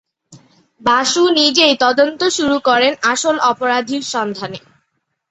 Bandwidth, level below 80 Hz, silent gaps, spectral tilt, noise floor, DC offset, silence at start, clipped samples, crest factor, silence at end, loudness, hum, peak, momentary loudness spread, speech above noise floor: 8.4 kHz; -58 dBFS; none; -2 dB/octave; -70 dBFS; under 0.1%; 0.3 s; under 0.1%; 16 dB; 0.7 s; -14 LUFS; none; 0 dBFS; 10 LU; 55 dB